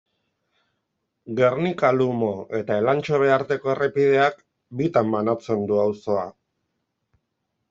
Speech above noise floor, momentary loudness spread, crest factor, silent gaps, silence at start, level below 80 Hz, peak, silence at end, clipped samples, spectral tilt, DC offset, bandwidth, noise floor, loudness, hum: 56 dB; 8 LU; 18 dB; none; 1.25 s; -66 dBFS; -4 dBFS; 1.4 s; under 0.1%; -7.5 dB/octave; under 0.1%; 7.4 kHz; -77 dBFS; -22 LUFS; none